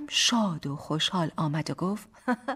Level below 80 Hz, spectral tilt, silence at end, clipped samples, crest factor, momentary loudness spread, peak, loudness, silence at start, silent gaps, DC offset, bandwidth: -64 dBFS; -3.5 dB/octave; 0 s; under 0.1%; 18 dB; 9 LU; -10 dBFS; -28 LUFS; 0 s; none; under 0.1%; 15 kHz